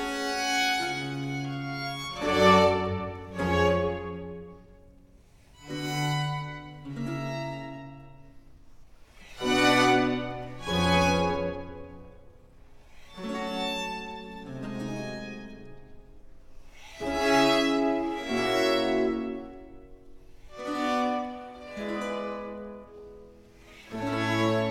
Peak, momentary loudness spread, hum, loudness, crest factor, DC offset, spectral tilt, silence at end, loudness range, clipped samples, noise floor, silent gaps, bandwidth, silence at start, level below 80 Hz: -6 dBFS; 21 LU; none; -27 LUFS; 22 dB; under 0.1%; -5 dB/octave; 0 s; 10 LU; under 0.1%; -55 dBFS; none; 16.5 kHz; 0 s; -52 dBFS